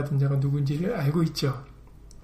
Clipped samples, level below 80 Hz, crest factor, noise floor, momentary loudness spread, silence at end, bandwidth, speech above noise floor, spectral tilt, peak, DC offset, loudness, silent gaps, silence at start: under 0.1%; -50 dBFS; 12 dB; -47 dBFS; 5 LU; 0 s; 13.5 kHz; 22 dB; -7.5 dB/octave; -14 dBFS; under 0.1%; -26 LUFS; none; 0 s